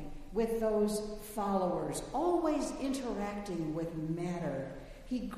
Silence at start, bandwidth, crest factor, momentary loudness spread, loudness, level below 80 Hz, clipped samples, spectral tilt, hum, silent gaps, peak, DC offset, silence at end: 0 s; 15.5 kHz; 16 dB; 9 LU; -35 LUFS; -52 dBFS; under 0.1%; -6 dB/octave; none; none; -18 dBFS; under 0.1%; 0 s